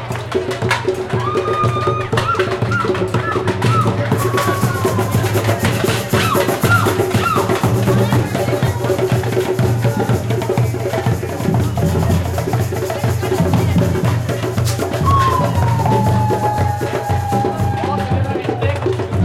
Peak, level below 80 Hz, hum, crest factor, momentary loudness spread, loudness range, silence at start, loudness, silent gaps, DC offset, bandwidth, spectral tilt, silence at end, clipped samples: -2 dBFS; -40 dBFS; none; 14 dB; 4 LU; 2 LU; 0 s; -17 LUFS; none; under 0.1%; 16 kHz; -6 dB/octave; 0 s; under 0.1%